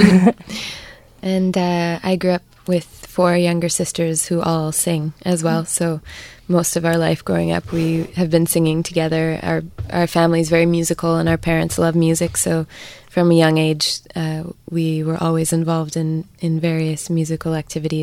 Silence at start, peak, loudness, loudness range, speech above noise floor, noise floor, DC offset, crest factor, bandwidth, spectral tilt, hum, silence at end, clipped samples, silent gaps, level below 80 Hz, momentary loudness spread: 0 s; 0 dBFS; -18 LUFS; 3 LU; 21 dB; -39 dBFS; under 0.1%; 18 dB; 16 kHz; -5.5 dB/octave; none; 0 s; under 0.1%; none; -44 dBFS; 9 LU